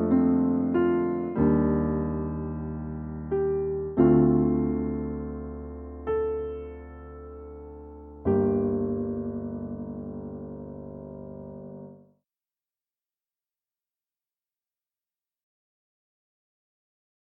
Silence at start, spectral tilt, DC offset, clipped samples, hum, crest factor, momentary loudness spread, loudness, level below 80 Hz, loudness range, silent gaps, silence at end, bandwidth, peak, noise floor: 0 s; -13 dB/octave; under 0.1%; under 0.1%; none; 20 dB; 20 LU; -27 LUFS; -44 dBFS; 17 LU; none; 5.3 s; 3.3 kHz; -8 dBFS; under -90 dBFS